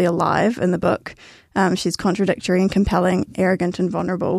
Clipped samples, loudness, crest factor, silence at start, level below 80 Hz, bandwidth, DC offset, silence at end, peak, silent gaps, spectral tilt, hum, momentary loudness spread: under 0.1%; -20 LUFS; 16 dB; 0 s; -40 dBFS; 13 kHz; under 0.1%; 0 s; -4 dBFS; none; -6 dB/octave; none; 4 LU